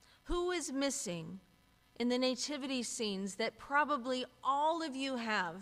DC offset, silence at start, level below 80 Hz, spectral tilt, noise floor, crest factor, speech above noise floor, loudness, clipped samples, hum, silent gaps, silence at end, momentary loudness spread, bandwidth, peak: under 0.1%; 0.25 s; -58 dBFS; -3 dB/octave; -67 dBFS; 18 dB; 31 dB; -36 LUFS; under 0.1%; none; none; 0 s; 7 LU; 15 kHz; -18 dBFS